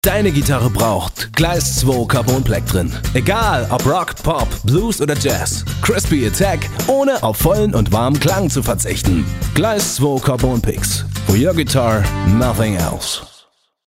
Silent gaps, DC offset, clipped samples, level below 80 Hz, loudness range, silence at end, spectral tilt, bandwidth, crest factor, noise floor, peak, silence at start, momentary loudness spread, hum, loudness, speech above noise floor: none; under 0.1%; under 0.1%; -28 dBFS; 1 LU; 0.6 s; -5 dB/octave; 16.5 kHz; 14 dB; -52 dBFS; -2 dBFS; 0.05 s; 4 LU; none; -16 LUFS; 36 dB